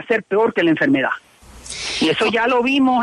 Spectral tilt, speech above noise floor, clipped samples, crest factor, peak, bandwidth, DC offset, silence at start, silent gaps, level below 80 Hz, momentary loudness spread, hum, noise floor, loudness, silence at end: -4 dB/octave; 20 dB; under 0.1%; 12 dB; -6 dBFS; 11.5 kHz; under 0.1%; 0 s; none; -52 dBFS; 10 LU; none; -37 dBFS; -17 LUFS; 0 s